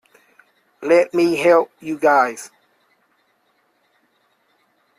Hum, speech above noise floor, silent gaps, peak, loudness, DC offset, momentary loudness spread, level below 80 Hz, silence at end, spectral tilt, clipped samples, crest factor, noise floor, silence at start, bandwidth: none; 48 dB; none; -4 dBFS; -17 LUFS; under 0.1%; 16 LU; -68 dBFS; 2.5 s; -5 dB/octave; under 0.1%; 18 dB; -64 dBFS; 0.8 s; 14 kHz